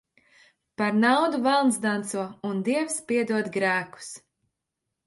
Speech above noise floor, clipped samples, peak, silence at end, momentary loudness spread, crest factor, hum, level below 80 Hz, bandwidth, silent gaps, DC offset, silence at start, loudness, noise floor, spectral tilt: 59 dB; under 0.1%; -8 dBFS; 0.9 s; 17 LU; 18 dB; none; -72 dBFS; 11.5 kHz; none; under 0.1%; 0.8 s; -25 LUFS; -83 dBFS; -4 dB/octave